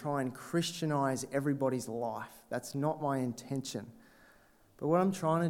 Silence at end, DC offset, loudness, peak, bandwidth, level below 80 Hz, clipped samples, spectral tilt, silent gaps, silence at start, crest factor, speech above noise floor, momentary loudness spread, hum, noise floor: 0 s; under 0.1%; -34 LUFS; -16 dBFS; 17 kHz; -72 dBFS; under 0.1%; -6 dB/octave; none; 0 s; 18 dB; 30 dB; 11 LU; none; -63 dBFS